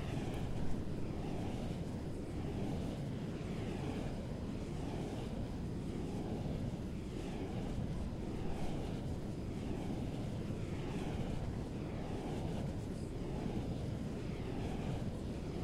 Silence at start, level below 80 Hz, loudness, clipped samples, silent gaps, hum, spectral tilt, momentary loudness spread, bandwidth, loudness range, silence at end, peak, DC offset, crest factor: 0 s; -48 dBFS; -42 LUFS; under 0.1%; none; none; -7.5 dB/octave; 2 LU; 15 kHz; 1 LU; 0 s; -24 dBFS; under 0.1%; 16 dB